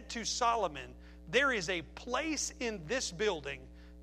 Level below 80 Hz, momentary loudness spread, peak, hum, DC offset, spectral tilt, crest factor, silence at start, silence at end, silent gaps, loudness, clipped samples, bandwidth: -54 dBFS; 16 LU; -14 dBFS; none; under 0.1%; -2.5 dB/octave; 22 dB; 0 s; 0 s; none; -34 LUFS; under 0.1%; 15 kHz